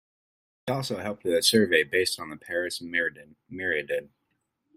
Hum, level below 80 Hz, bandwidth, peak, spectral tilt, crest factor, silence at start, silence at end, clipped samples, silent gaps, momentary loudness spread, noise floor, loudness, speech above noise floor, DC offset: none; -68 dBFS; 16 kHz; -8 dBFS; -3 dB/octave; 22 dB; 0.65 s; 0.7 s; under 0.1%; none; 12 LU; -77 dBFS; -26 LUFS; 50 dB; under 0.1%